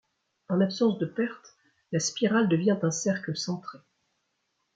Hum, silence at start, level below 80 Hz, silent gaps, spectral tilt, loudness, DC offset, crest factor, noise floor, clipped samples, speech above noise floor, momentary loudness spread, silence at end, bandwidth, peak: none; 0.5 s; -74 dBFS; none; -5 dB/octave; -27 LUFS; under 0.1%; 16 dB; -77 dBFS; under 0.1%; 50 dB; 10 LU; 1 s; 9.4 kHz; -12 dBFS